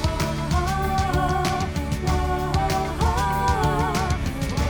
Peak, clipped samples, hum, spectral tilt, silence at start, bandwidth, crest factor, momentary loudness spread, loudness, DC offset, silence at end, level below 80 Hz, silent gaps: -8 dBFS; under 0.1%; none; -5.5 dB/octave; 0 s; over 20 kHz; 14 dB; 4 LU; -23 LUFS; under 0.1%; 0 s; -28 dBFS; none